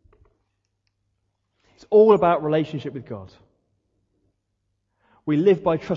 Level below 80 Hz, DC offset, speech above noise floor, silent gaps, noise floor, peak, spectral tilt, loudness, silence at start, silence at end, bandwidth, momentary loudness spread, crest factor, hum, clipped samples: -60 dBFS; under 0.1%; 55 dB; none; -75 dBFS; -4 dBFS; -8.5 dB/octave; -19 LUFS; 1.9 s; 0 s; 6.6 kHz; 20 LU; 20 dB; none; under 0.1%